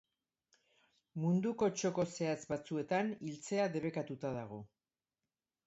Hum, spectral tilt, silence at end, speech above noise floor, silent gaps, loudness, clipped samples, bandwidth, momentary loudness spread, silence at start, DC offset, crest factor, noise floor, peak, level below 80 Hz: none; -6.5 dB/octave; 1 s; over 53 dB; none; -37 LUFS; under 0.1%; 8 kHz; 10 LU; 1.15 s; under 0.1%; 16 dB; under -90 dBFS; -22 dBFS; -74 dBFS